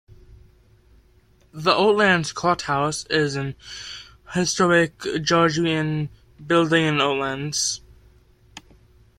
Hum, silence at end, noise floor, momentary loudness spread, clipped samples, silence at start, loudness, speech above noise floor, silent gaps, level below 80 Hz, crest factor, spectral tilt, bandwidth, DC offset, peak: none; 0.6 s; -56 dBFS; 15 LU; under 0.1%; 1.55 s; -21 LUFS; 35 dB; none; -54 dBFS; 20 dB; -4 dB/octave; 15 kHz; under 0.1%; -2 dBFS